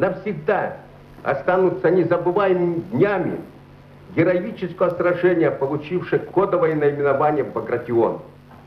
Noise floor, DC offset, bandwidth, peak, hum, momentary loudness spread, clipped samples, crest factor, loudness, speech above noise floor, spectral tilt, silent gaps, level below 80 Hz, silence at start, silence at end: -44 dBFS; under 0.1%; 5.6 kHz; -4 dBFS; none; 8 LU; under 0.1%; 16 dB; -20 LUFS; 24 dB; -9.5 dB/octave; none; -56 dBFS; 0 s; 0.1 s